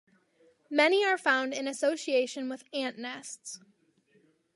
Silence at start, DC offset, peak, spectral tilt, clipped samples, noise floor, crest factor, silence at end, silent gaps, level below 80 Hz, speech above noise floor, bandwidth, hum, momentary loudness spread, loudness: 0.7 s; under 0.1%; -10 dBFS; -1.5 dB/octave; under 0.1%; -68 dBFS; 22 dB; 1 s; none; -88 dBFS; 38 dB; 11.5 kHz; none; 17 LU; -29 LUFS